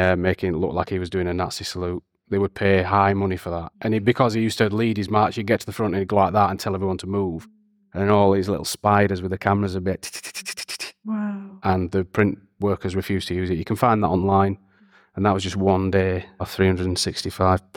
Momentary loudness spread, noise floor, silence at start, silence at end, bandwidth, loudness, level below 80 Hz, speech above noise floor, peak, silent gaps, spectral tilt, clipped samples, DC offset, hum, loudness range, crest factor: 11 LU; -56 dBFS; 0 s; 0.15 s; 18 kHz; -22 LUFS; -48 dBFS; 34 dB; -4 dBFS; none; -6 dB/octave; under 0.1%; under 0.1%; none; 4 LU; 18 dB